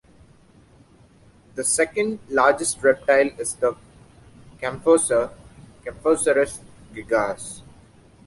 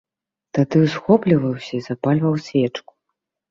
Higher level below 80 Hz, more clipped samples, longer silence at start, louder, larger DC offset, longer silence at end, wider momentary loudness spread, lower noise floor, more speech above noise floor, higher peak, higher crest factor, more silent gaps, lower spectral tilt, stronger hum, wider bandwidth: about the same, -54 dBFS vs -58 dBFS; neither; first, 1.55 s vs 0.55 s; about the same, -21 LUFS vs -19 LUFS; neither; about the same, 0.65 s vs 0.7 s; first, 19 LU vs 11 LU; second, -53 dBFS vs -79 dBFS; second, 32 dB vs 61 dB; about the same, -4 dBFS vs -2 dBFS; about the same, 20 dB vs 18 dB; neither; second, -3 dB/octave vs -8 dB/octave; neither; first, 11.5 kHz vs 7.4 kHz